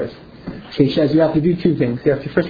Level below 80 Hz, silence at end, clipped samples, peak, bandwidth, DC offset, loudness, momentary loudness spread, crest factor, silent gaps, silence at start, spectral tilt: -44 dBFS; 0 s; under 0.1%; 0 dBFS; 5 kHz; under 0.1%; -17 LUFS; 18 LU; 16 dB; none; 0 s; -9.5 dB/octave